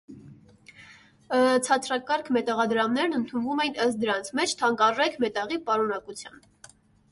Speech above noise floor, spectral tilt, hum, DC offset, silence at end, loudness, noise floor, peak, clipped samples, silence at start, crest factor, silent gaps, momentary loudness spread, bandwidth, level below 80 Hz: 29 dB; -3 dB/octave; none; under 0.1%; 0.85 s; -25 LUFS; -54 dBFS; -8 dBFS; under 0.1%; 0.1 s; 18 dB; none; 7 LU; 11.5 kHz; -68 dBFS